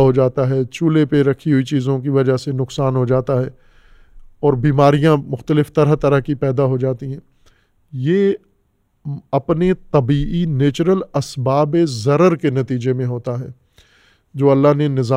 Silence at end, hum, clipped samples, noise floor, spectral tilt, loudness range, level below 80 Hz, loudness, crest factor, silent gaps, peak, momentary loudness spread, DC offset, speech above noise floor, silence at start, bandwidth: 0 s; none; under 0.1%; -62 dBFS; -8 dB/octave; 4 LU; -42 dBFS; -17 LUFS; 16 dB; none; 0 dBFS; 11 LU; under 0.1%; 47 dB; 0 s; 10.5 kHz